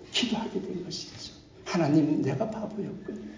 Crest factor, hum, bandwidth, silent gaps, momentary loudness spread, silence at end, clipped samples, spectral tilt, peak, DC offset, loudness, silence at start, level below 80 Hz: 18 dB; none; 7.6 kHz; none; 16 LU; 0 s; under 0.1%; -5.5 dB/octave; -12 dBFS; under 0.1%; -29 LUFS; 0 s; -60 dBFS